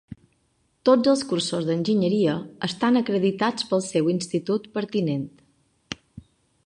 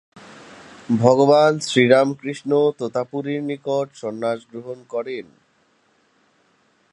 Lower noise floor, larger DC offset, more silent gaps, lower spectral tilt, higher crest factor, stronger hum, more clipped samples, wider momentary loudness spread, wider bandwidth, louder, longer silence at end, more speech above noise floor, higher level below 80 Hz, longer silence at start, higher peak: first, -68 dBFS vs -62 dBFS; neither; neither; about the same, -5.5 dB/octave vs -5.5 dB/octave; about the same, 20 dB vs 20 dB; neither; neither; second, 11 LU vs 16 LU; about the same, 11 kHz vs 11.5 kHz; second, -23 LUFS vs -19 LUFS; second, 0.45 s vs 1.7 s; about the same, 45 dB vs 43 dB; first, -62 dBFS vs -68 dBFS; about the same, 0.1 s vs 0.15 s; second, -4 dBFS vs 0 dBFS